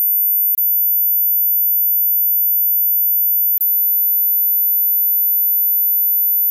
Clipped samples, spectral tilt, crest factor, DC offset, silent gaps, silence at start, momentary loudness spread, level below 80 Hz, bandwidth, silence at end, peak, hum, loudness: under 0.1%; 1 dB/octave; 4 dB; under 0.1%; none; 0 s; 0 LU; under -90 dBFS; 15 kHz; 0 s; -12 dBFS; none; -12 LUFS